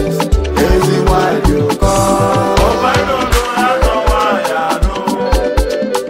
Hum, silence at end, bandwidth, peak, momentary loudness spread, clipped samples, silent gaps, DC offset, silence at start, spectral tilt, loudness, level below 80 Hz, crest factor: none; 0 s; 16.5 kHz; 0 dBFS; 4 LU; under 0.1%; none; under 0.1%; 0 s; -5 dB/octave; -13 LUFS; -18 dBFS; 12 dB